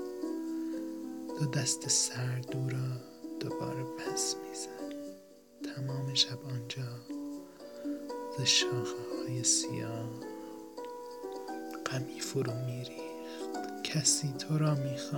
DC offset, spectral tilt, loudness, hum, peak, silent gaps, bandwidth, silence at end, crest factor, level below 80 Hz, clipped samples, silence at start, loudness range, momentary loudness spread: under 0.1%; -3.5 dB/octave; -34 LUFS; none; -12 dBFS; none; 17 kHz; 0 s; 22 dB; -74 dBFS; under 0.1%; 0 s; 7 LU; 16 LU